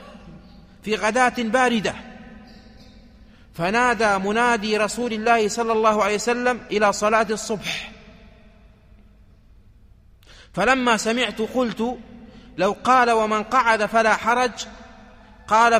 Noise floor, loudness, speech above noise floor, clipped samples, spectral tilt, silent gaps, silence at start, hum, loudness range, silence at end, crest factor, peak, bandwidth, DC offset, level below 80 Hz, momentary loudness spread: -50 dBFS; -20 LUFS; 31 dB; under 0.1%; -3.5 dB/octave; none; 0 s; none; 6 LU; 0 s; 18 dB; -4 dBFS; 15.5 kHz; under 0.1%; -50 dBFS; 11 LU